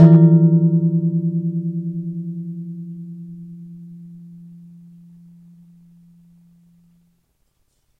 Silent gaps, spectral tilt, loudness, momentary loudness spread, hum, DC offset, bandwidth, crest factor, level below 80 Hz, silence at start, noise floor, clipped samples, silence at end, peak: none; -12.5 dB/octave; -17 LUFS; 27 LU; none; under 0.1%; 2 kHz; 18 dB; -66 dBFS; 0 s; -65 dBFS; under 0.1%; 3.65 s; -2 dBFS